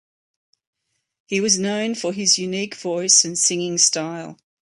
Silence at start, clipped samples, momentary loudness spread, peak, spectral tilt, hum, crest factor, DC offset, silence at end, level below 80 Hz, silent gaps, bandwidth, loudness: 1.3 s; under 0.1%; 12 LU; -2 dBFS; -1.5 dB/octave; none; 20 dB; under 0.1%; 0.3 s; -68 dBFS; none; 11.5 kHz; -18 LUFS